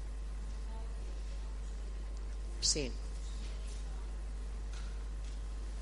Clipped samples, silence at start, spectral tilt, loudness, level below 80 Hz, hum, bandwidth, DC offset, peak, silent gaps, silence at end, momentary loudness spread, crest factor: under 0.1%; 0 s; -3 dB/octave; -41 LUFS; -40 dBFS; none; 11.5 kHz; under 0.1%; -18 dBFS; none; 0 s; 11 LU; 22 dB